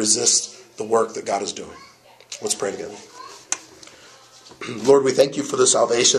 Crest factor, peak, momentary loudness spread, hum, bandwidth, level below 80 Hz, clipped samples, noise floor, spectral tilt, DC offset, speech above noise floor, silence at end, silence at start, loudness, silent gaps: 20 dB; -2 dBFS; 20 LU; none; 14 kHz; -66 dBFS; under 0.1%; -47 dBFS; -2 dB/octave; under 0.1%; 28 dB; 0 s; 0 s; -20 LUFS; none